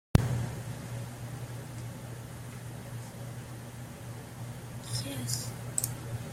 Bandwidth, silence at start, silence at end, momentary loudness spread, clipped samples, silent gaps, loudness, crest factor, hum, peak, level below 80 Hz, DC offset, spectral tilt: 16.5 kHz; 0.15 s; 0 s; 11 LU; under 0.1%; none; -37 LUFS; 32 dB; none; -4 dBFS; -50 dBFS; under 0.1%; -4.5 dB/octave